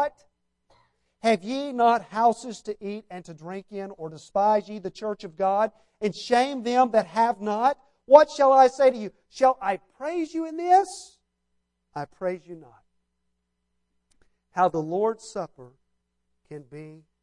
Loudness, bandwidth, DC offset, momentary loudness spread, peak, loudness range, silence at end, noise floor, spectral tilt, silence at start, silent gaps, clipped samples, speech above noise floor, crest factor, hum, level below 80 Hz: -23 LUFS; 11 kHz; under 0.1%; 20 LU; 0 dBFS; 10 LU; 0.25 s; -77 dBFS; -5 dB/octave; 0 s; none; under 0.1%; 54 dB; 24 dB; none; -68 dBFS